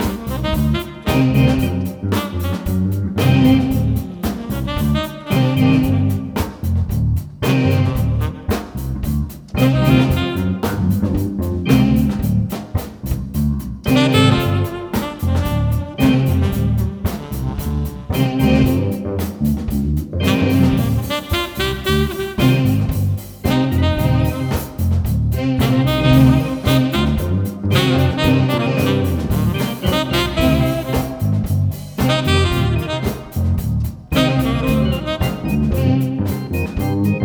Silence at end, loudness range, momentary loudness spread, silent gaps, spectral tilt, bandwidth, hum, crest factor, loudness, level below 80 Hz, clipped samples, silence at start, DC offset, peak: 0 s; 3 LU; 8 LU; none; -6.5 dB/octave; over 20 kHz; none; 16 dB; -18 LUFS; -28 dBFS; under 0.1%; 0 s; under 0.1%; 0 dBFS